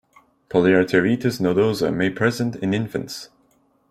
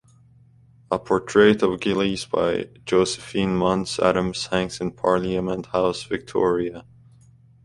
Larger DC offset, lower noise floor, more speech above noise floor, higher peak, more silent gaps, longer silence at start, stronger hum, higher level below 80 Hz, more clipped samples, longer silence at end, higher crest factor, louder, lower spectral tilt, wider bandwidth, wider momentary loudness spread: neither; first, -61 dBFS vs -53 dBFS; first, 42 dB vs 32 dB; about the same, -2 dBFS vs -2 dBFS; neither; second, 0.5 s vs 0.9 s; neither; second, -56 dBFS vs -50 dBFS; neither; second, 0.65 s vs 0.85 s; about the same, 20 dB vs 20 dB; about the same, -20 LUFS vs -22 LUFS; first, -6.5 dB/octave vs -5 dB/octave; first, 15.5 kHz vs 11.5 kHz; about the same, 11 LU vs 11 LU